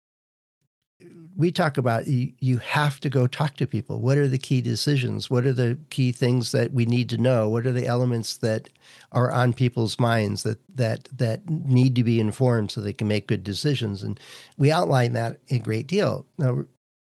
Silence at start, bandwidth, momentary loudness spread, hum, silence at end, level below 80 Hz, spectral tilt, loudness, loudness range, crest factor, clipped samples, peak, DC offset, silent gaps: 1.05 s; 12.5 kHz; 7 LU; none; 0.45 s; -66 dBFS; -6.5 dB/octave; -24 LUFS; 2 LU; 18 dB; under 0.1%; -6 dBFS; under 0.1%; none